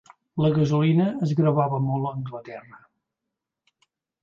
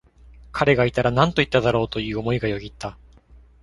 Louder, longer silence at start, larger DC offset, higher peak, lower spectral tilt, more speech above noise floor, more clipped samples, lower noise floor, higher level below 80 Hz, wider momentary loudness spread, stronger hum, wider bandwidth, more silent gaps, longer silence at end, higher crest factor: about the same, -23 LUFS vs -21 LUFS; about the same, 0.35 s vs 0.3 s; neither; second, -10 dBFS vs -2 dBFS; first, -9 dB/octave vs -6.5 dB/octave; first, 62 dB vs 29 dB; neither; first, -85 dBFS vs -50 dBFS; second, -60 dBFS vs -42 dBFS; about the same, 16 LU vs 15 LU; neither; second, 7 kHz vs 11.5 kHz; neither; first, 1.6 s vs 0.25 s; second, 16 dB vs 22 dB